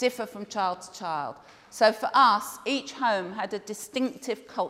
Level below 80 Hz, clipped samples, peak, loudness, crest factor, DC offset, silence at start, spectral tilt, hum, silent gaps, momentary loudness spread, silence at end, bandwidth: -74 dBFS; under 0.1%; -8 dBFS; -27 LUFS; 20 dB; under 0.1%; 0 s; -3 dB/octave; none; none; 14 LU; 0 s; 16 kHz